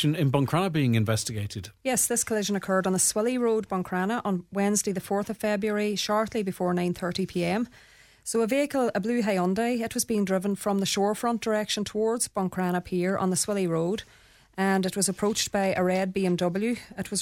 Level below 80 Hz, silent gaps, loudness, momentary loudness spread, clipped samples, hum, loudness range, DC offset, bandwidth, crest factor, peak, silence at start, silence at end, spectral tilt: -58 dBFS; none; -26 LUFS; 6 LU; under 0.1%; none; 2 LU; under 0.1%; 17 kHz; 16 dB; -10 dBFS; 0 s; 0 s; -4.5 dB/octave